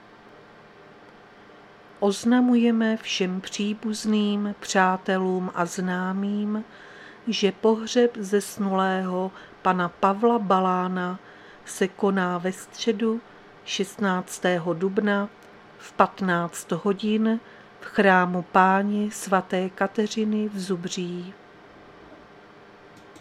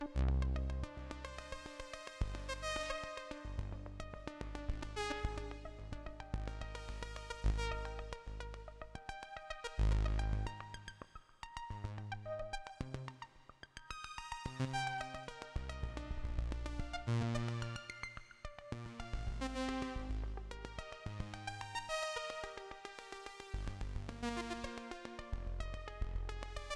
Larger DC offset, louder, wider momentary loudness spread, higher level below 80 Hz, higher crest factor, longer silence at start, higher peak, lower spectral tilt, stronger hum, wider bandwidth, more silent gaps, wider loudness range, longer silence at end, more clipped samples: neither; first, -24 LUFS vs -44 LUFS; about the same, 11 LU vs 11 LU; second, -68 dBFS vs -44 dBFS; first, 24 dB vs 18 dB; first, 1.05 s vs 0 s; first, -2 dBFS vs -24 dBFS; about the same, -5 dB/octave vs -5.5 dB/octave; neither; first, 14.5 kHz vs 11.5 kHz; neither; about the same, 4 LU vs 4 LU; about the same, 0 s vs 0 s; neither